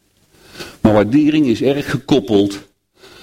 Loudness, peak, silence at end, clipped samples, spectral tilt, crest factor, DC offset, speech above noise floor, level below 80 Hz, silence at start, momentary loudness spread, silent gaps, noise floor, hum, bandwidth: -15 LUFS; -2 dBFS; 0.6 s; under 0.1%; -6.5 dB/octave; 14 dB; under 0.1%; 36 dB; -44 dBFS; 0.55 s; 17 LU; none; -50 dBFS; none; 14.5 kHz